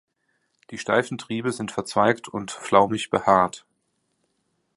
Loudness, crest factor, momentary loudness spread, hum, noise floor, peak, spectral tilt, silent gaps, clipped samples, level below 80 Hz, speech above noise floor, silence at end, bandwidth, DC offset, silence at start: -23 LUFS; 22 dB; 13 LU; none; -73 dBFS; -2 dBFS; -5 dB/octave; none; under 0.1%; -60 dBFS; 50 dB; 1.2 s; 11.5 kHz; under 0.1%; 0.7 s